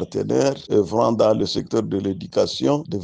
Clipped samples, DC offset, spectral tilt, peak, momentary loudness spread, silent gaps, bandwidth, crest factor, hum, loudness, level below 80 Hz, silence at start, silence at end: under 0.1%; under 0.1%; -6 dB/octave; -4 dBFS; 6 LU; none; 9.8 kHz; 16 dB; none; -21 LUFS; -54 dBFS; 0 s; 0 s